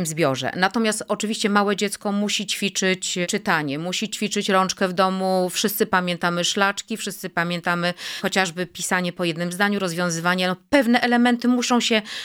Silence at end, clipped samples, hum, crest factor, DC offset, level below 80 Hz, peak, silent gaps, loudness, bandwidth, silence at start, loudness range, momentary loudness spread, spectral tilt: 0 s; under 0.1%; none; 20 dB; under 0.1%; -62 dBFS; -2 dBFS; none; -21 LUFS; 17.5 kHz; 0 s; 2 LU; 6 LU; -3.5 dB/octave